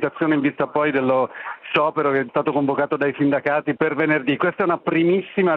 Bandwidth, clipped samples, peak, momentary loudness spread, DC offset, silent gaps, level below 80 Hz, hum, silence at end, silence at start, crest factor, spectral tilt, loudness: 4.8 kHz; under 0.1%; -4 dBFS; 3 LU; under 0.1%; none; -66 dBFS; none; 0 s; 0 s; 16 dB; -9 dB/octave; -20 LUFS